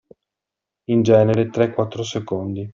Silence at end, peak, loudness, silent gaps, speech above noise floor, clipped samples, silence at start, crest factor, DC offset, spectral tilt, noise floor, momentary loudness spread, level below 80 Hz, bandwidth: 0 s; -2 dBFS; -19 LUFS; none; 67 dB; under 0.1%; 0.9 s; 18 dB; under 0.1%; -7 dB/octave; -85 dBFS; 11 LU; -56 dBFS; 7.4 kHz